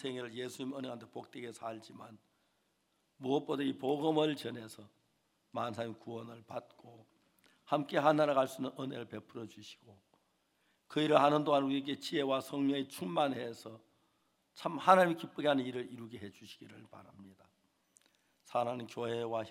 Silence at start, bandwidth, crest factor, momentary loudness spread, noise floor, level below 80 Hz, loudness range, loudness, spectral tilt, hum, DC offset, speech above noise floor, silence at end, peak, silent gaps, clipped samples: 0 s; 16 kHz; 26 dB; 22 LU; -78 dBFS; -88 dBFS; 10 LU; -34 LUFS; -5.5 dB/octave; none; under 0.1%; 43 dB; 0 s; -10 dBFS; none; under 0.1%